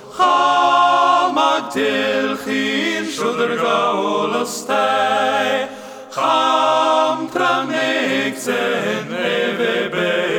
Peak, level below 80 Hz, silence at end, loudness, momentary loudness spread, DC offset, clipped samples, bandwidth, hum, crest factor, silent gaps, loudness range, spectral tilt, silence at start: -2 dBFS; -68 dBFS; 0 s; -17 LUFS; 7 LU; under 0.1%; under 0.1%; 19.5 kHz; none; 14 dB; none; 2 LU; -3.5 dB/octave; 0 s